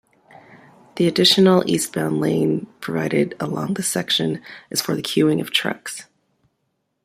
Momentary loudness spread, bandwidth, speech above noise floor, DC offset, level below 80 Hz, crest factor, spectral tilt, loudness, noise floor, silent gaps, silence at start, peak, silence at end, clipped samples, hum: 13 LU; 16 kHz; 53 dB; under 0.1%; -62 dBFS; 20 dB; -4.5 dB/octave; -19 LUFS; -72 dBFS; none; 0.5 s; -2 dBFS; 1 s; under 0.1%; none